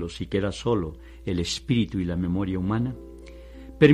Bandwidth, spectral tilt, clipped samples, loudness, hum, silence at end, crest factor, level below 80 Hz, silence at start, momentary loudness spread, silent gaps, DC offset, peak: 12 kHz; -6.5 dB/octave; under 0.1%; -27 LUFS; none; 0 s; 22 dB; -44 dBFS; 0 s; 19 LU; none; under 0.1%; -4 dBFS